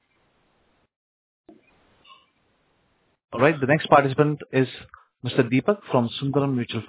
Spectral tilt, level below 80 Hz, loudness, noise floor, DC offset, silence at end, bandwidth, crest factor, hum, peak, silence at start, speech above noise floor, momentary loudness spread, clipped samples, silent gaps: -10.5 dB/octave; -62 dBFS; -22 LUFS; -67 dBFS; under 0.1%; 0 s; 4 kHz; 24 dB; none; -2 dBFS; 3.3 s; 46 dB; 10 LU; under 0.1%; none